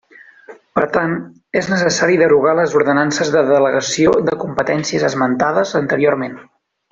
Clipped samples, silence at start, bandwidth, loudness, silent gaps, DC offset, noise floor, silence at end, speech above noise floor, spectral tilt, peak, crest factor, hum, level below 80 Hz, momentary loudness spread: under 0.1%; 0.5 s; 7.8 kHz; -15 LUFS; none; under 0.1%; -41 dBFS; 0.5 s; 26 dB; -4.5 dB/octave; -2 dBFS; 14 dB; none; -54 dBFS; 8 LU